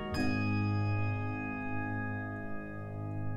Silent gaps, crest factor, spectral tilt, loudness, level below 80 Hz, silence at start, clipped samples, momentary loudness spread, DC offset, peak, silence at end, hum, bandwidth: none; 14 dB; -7.5 dB/octave; -35 LUFS; -52 dBFS; 0 s; under 0.1%; 9 LU; under 0.1%; -20 dBFS; 0 s; none; 11 kHz